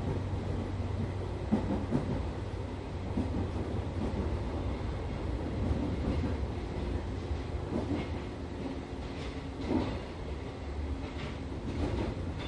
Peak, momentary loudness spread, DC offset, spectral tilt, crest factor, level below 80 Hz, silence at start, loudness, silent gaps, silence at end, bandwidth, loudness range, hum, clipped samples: -16 dBFS; 6 LU; under 0.1%; -7.5 dB/octave; 18 dB; -40 dBFS; 0 s; -36 LUFS; none; 0 s; 10.5 kHz; 3 LU; none; under 0.1%